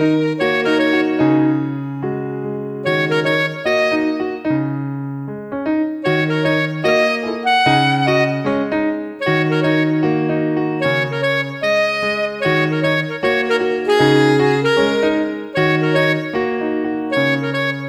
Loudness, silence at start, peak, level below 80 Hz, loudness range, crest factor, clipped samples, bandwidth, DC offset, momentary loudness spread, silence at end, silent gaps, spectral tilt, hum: -17 LUFS; 0 s; -2 dBFS; -54 dBFS; 3 LU; 16 dB; under 0.1%; 12.5 kHz; under 0.1%; 8 LU; 0 s; none; -6.5 dB/octave; none